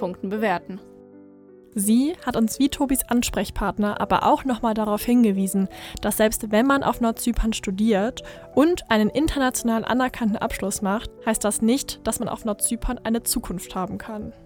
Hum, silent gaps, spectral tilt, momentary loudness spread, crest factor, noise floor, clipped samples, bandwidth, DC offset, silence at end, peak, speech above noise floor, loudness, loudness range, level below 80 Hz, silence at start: none; none; -4.5 dB/octave; 9 LU; 18 dB; -48 dBFS; under 0.1%; 19.5 kHz; under 0.1%; 0.1 s; -4 dBFS; 26 dB; -23 LUFS; 3 LU; -40 dBFS; 0 s